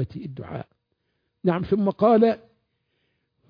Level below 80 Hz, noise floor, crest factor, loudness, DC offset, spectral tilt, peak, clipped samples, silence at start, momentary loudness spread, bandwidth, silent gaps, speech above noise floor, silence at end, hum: -56 dBFS; -75 dBFS; 18 dB; -22 LUFS; under 0.1%; -10.5 dB/octave; -6 dBFS; under 0.1%; 0 s; 18 LU; 5.2 kHz; none; 53 dB; 1.15 s; none